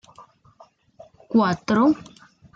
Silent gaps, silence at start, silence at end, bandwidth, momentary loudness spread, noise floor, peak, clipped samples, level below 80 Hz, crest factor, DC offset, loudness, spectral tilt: none; 1.3 s; 0.55 s; 7.4 kHz; 4 LU; -54 dBFS; -8 dBFS; under 0.1%; -62 dBFS; 16 dB; under 0.1%; -21 LUFS; -6.5 dB/octave